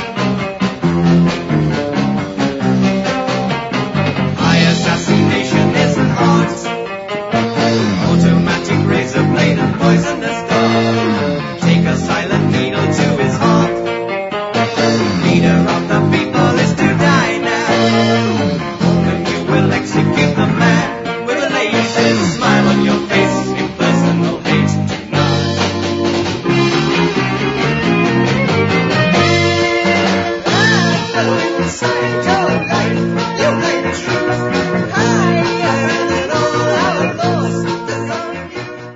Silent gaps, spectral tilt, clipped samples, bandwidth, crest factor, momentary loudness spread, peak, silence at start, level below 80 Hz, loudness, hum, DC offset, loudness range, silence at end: none; -5.5 dB/octave; under 0.1%; 7.8 kHz; 14 dB; 6 LU; 0 dBFS; 0 s; -42 dBFS; -14 LUFS; none; under 0.1%; 2 LU; 0 s